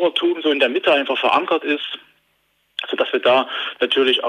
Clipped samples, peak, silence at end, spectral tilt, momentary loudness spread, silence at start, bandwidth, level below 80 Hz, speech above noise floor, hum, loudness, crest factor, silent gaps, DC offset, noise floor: under 0.1%; -4 dBFS; 0 s; -4 dB/octave; 12 LU; 0 s; 10.5 kHz; -72 dBFS; 47 dB; none; -18 LUFS; 16 dB; none; under 0.1%; -65 dBFS